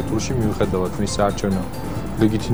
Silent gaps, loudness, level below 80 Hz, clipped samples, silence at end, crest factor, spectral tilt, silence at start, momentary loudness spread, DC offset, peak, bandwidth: none; -22 LUFS; -34 dBFS; under 0.1%; 0 s; 16 dB; -6 dB/octave; 0 s; 7 LU; 2%; -4 dBFS; over 20 kHz